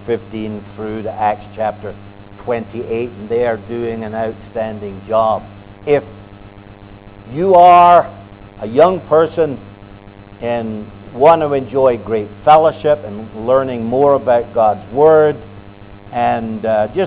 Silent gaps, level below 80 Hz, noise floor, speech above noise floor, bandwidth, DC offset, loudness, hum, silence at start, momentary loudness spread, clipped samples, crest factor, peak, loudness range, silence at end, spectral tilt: none; -44 dBFS; -37 dBFS; 23 dB; 4 kHz; under 0.1%; -14 LUFS; none; 0 s; 17 LU; under 0.1%; 14 dB; 0 dBFS; 9 LU; 0 s; -10 dB/octave